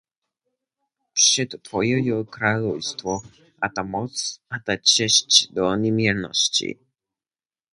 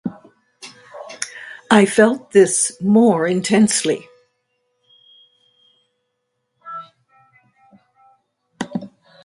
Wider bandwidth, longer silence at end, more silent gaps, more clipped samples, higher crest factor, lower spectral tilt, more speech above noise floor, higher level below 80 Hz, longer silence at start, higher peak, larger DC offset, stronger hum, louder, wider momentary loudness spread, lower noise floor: about the same, 11.5 kHz vs 11.5 kHz; first, 1 s vs 0.4 s; neither; neither; about the same, 24 dB vs 20 dB; second, -2.5 dB/octave vs -4 dB/octave; first, over 68 dB vs 59 dB; first, -58 dBFS vs -64 dBFS; first, 1.15 s vs 0.05 s; about the same, 0 dBFS vs 0 dBFS; neither; neither; second, -20 LUFS vs -16 LUFS; second, 13 LU vs 23 LU; first, under -90 dBFS vs -74 dBFS